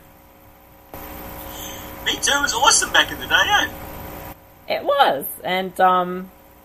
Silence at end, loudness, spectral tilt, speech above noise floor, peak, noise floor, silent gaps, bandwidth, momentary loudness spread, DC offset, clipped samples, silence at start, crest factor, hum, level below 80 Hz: 0.35 s; -18 LUFS; -1 dB/octave; 29 dB; 0 dBFS; -48 dBFS; none; 15.5 kHz; 20 LU; under 0.1%; under 0.1%; 0.95 s; 22 dB; none; -46 dBFS